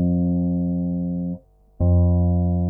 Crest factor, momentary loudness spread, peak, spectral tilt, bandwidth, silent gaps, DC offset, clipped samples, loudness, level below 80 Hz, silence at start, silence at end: 10 dB; 10 LU; -10 dBFS; -16.5 dB/octave; 1.1 kHz; none; under 0.1%; under 0.1%; -21 LUFS; -34 dBFS; 0 s; 0 s